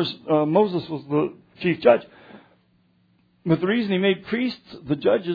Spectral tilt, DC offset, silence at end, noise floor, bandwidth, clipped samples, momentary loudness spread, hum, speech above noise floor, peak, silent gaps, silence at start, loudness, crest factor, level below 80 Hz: -9 dB/octave; under 0.1%; 0 s; -62 dBFS; 5 kHz; under 0.1%; 10 LU; none; 41 dB; -2 dBFS; none; 0 s; -22 LUFS; 20 dB; -62 dBFS